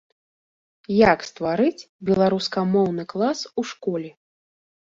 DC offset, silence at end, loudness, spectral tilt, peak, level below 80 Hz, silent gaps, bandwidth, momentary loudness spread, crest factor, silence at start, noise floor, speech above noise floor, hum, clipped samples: under 0.1%; 0.8 s; -22 LUFS; -6 dB/octave; -2 dBFS; -54 dBFS; 1.89-1.99 s; 7.8 kHz; 11 LU; 20 dB; 0.9 s; under -90 dBFS; over 69 dB; none; under 0.1%